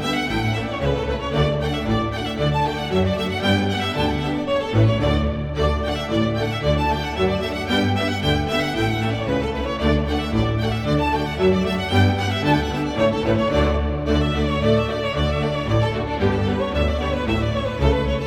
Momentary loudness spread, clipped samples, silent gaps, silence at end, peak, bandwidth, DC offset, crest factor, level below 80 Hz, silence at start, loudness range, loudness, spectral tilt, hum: 4 LU; under 0.1%; none; 0 s; -4 dBFS; 15 kHz; under 0.1%; 16 dB; -30 dBFS; 0 s; 2 LU; -21 LUFS; -6.5 dB/octave; none